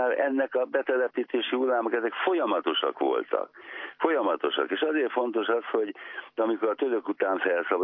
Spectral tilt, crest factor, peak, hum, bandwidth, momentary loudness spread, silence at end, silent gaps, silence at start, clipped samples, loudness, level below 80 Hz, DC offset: -7 dB/octave; 16 dB; -10 dBFS; none; 3.9 kHz; 5 LU; 0 s; none; 0 s; under 0.1%; -27 LUFS; under -90 dBFS; under 0.1%